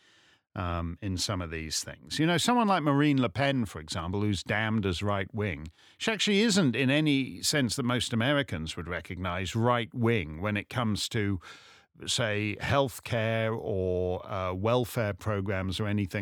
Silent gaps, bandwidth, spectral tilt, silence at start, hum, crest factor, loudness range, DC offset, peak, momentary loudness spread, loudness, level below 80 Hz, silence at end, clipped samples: none; 18 kHz; -5 dB/octave; 0.55 s; none; 18 dB; 3 LU; under 0.1%; -10 dBFS; 9 LU; -29 LUFS; -52 dBFS; 0 s; under 0.1%